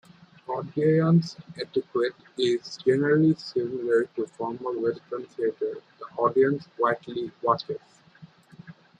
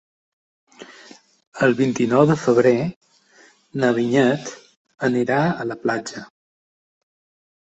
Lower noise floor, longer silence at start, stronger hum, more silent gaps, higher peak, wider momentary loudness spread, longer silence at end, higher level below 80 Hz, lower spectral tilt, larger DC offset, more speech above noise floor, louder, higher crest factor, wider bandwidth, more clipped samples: about the same, -52 dBFS vs -53 dBFS; second, 0.5 s vs 0.8 s; neither; second, none vs 1.47-1.52 s, 2.96-3.01 s, 4.77-4.85 s; second, -8 dBFS vs -2 dBFS; about the same, 14 LU vs 16 LU; second, 0.25 s vs 1.5 s; second, -70 dBFS vs -60 dBFS; about the same, -7.5 dB/octave vs -6.5 dB/octave; neither; second, 27 dB vs 35 dB; second, -26 LUFS vs -19 LUFS; about the same, 18 dB vs 20 dB; first, 9.2 kHz vs 8.2 kHz; neither